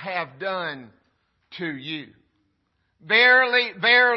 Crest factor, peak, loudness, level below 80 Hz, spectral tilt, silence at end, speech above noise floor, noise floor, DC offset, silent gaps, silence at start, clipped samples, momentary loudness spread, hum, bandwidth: 18 dB; -4 dBFS; -19 LUFS; -76 dBFS; -5 dB/octave; 0 s; 50 dB; -71 dBFS; under 0.1%; none; 0 s; under 0.1%; 18 LU; none; 6 kHz